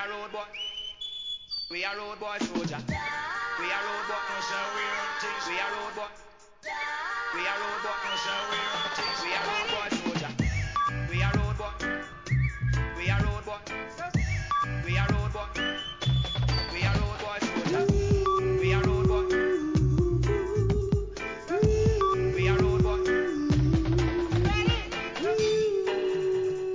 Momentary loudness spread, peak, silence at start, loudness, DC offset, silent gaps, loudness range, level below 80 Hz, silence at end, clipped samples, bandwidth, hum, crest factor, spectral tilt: 9 LU; -12 dBFS; 0 s; -28 LUFS; 0.1%; none; 6 LU; -36 dBFS; 0 s; under 0.1%; 7.6 kHz; none; 16 dB; -6 dB/octave